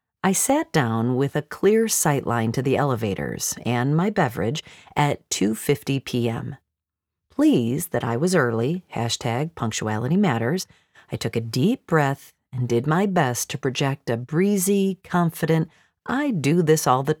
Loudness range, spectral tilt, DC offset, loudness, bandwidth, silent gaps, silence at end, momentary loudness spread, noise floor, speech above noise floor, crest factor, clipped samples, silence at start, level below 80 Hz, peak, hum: 3 LU; -5 dB/octave; under 0.1%; -22 LUFS; 19 kHz; none; 0.05 s; 8 LU; -85 dBFS; 64 dB; 18 dB; under 0.1%; 0.25 s; -58 dBFS; -4 dBFS; none